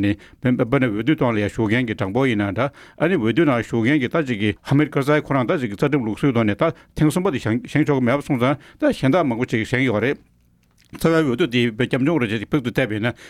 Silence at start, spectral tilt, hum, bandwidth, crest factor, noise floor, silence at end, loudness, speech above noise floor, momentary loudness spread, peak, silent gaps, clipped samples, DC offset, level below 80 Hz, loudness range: 0 s; -7 dB/octave; none; 14.5 kHz; 14 dB; -58 dBFS; 0 s; -20 LUFS; 38 dB; 4 LU; -4 dBFS; none; under 0.1%; under 0.1%; -48 dBFS; 1 LU